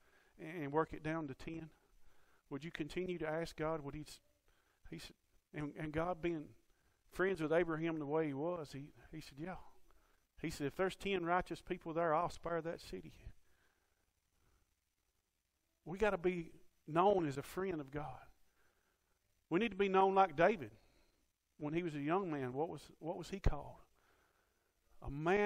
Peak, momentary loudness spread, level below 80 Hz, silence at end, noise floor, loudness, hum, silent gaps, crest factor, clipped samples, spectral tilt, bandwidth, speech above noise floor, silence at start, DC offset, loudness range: -18 dBFS; 19 LU; -58 dBFS; 0 s; -85 dBFS; -39 LUFS; none; none; 24 dB; under 0.1%; -6.5 dB/octave; 16 kHz; 46 dB; 0.4 s; under 0.1%; 8 LU